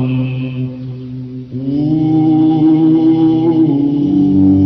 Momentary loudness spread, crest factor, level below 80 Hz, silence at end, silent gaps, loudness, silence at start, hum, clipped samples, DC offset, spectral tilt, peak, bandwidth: 15 LU; 10 dB; -48 dBFS; 0 s; none; -12 LUFS; 0 s; none; under 0.1%; under 0.1%; -11 dB/octave; -2 dBFS; 5.4 kHz